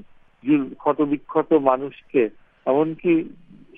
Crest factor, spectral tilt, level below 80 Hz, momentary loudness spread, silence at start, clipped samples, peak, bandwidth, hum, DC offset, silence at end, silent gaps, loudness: 20 dB; -10 dB/octave; -60 dBFS; 8 LU; 0.45 s; under 0.1%; -2 dBFS; 3.7 kHz; none; under 0.1%; 0.5 s; none; -22 LUFS